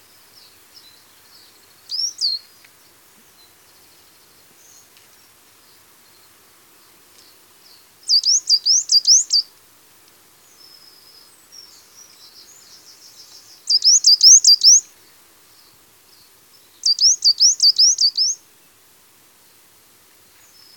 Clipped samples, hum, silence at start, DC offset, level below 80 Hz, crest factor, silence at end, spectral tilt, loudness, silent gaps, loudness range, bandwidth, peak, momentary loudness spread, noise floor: under 0.1%; none; 1.9 s; under 0.1%; -76 dBFS; 20 dB; 2.4 s; 5 dB/octave; -12 LUFS; none; 15 LU; 18 kHz; 0 dBFS; 16 LU; -52 dBFS